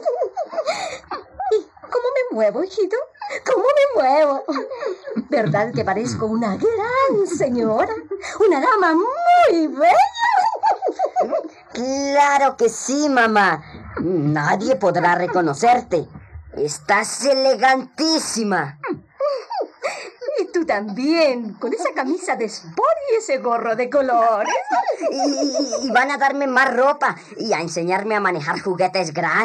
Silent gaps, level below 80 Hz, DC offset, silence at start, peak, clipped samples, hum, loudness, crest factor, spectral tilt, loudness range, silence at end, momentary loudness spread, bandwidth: none; -58 dBFS; under 0.1%; 0 s; -4 dBFS; under 0.1%; none; -19 LUFS; 16 dB; -4.5 dB/octave; 5 LU; 0 s; 11 LU; 12.5 kHz